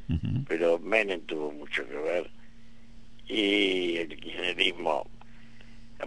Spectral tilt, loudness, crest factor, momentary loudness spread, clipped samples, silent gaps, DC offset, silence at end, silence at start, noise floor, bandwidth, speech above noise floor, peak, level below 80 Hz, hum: -5.5 dB/octave; -29 LUFS; 22 dB; 10 LU; under 0.1%; none; 0.8%; 0 s; 0 s; -53 dBFS; 10.5 kHz; 23 dB; -8 dBFS; -52 dBFS; none